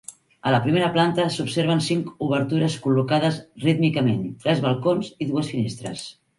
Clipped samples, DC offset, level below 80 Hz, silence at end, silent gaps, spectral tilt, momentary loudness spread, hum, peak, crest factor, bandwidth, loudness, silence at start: under 0.1%; under 0.1%; -60 dBFS; 0.25 s; none; -6 dB/octave; 7 LU; none; -6 dBFS; 16 dB; 11.5 kHz; -22 LUFS; 0.1 s